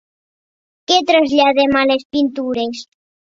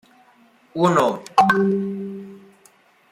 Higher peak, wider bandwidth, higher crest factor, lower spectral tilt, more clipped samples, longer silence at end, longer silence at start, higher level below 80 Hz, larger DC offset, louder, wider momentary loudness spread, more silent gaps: first, 0 dBFS vs -4 dBFS; second, 7.8 kHz vs 15.5 kHz; about the same, 16 dB vs 18 dB; second, -3 dB/octave vs -6 dB/octave; neither; second, 0.5 s vs 0.75 s; first, 0.9 s vs 0.75 s; first, -54 dBFS vs -64 dBFS; neither; first, -15 LUFS vs -19 LUFS; second, 11 LU vs 18 LU; first, 2.05-2.10 s vs none